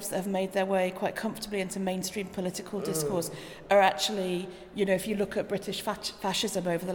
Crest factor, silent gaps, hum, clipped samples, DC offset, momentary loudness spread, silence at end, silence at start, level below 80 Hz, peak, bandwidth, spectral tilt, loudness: 18 dB; none; none; under 0.1%; under 0.1%; 9 LU; 0 s; 0 s; -60 dBFS; -12 dBFS; 19 kHz; -4 dB/octave; -30 LUFS